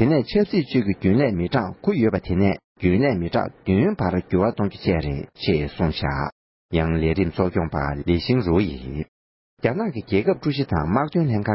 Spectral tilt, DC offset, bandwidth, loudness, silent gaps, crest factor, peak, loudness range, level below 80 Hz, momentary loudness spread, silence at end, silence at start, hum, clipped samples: -12 dB/octave; under 0.1%; 5.8 kHz; -22 LUFS; 2.64-2.75 s, 6.32-6.69 s, 9.08-9.57 s; 16 dB; -6 dBFS; 2 LU; -36 dBFS; 6 LU; 0 s; 0 s; none; under 0.1%